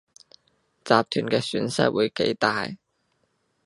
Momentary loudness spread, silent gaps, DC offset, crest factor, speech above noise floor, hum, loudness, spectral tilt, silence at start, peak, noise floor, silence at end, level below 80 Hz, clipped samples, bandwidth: 12 LU; none; under 0.1%; 24 dB; 48 dB; none; -24 LUFS; -5 dB/octave; 0.85 s; -2 dBFS; -71 dBFS; 0.9 s; -64 dBFS; under 0.1%; 11.5 kHz